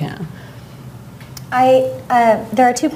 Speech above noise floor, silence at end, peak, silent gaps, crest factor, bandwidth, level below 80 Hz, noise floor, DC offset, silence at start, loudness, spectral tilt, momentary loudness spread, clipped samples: 21 dB; 0 s; -2 dBFS; none; 14 dB; 16 kHz; -50 dBFS; -35 dBFS; under 0.1%; 0 s; -15 LUFS; -5 dB/octave; 23 LU; under 0.1%